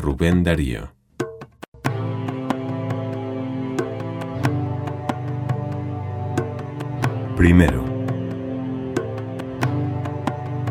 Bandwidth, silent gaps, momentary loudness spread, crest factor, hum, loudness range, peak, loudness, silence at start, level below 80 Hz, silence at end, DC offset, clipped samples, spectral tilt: 15 kHz; 1.68-1.72 s; 11 LU; 22 dB; none; 6 LU; 0 dBFS; -24 LUFS; 0 s; -36 dBFS; 0 s; under 0.1%; under 0.1%; -7.5 dB/octave